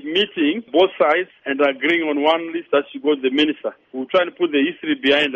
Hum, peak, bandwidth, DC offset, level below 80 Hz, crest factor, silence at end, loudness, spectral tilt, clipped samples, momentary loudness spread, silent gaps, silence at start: none; -4 dBFS; 8 kHz; under 0.1%; -64 dBFS; 16 dB; 0 s; -19 LUFS; -5 dB/octave; under 0.1%; 5 LU; none; 0.05 s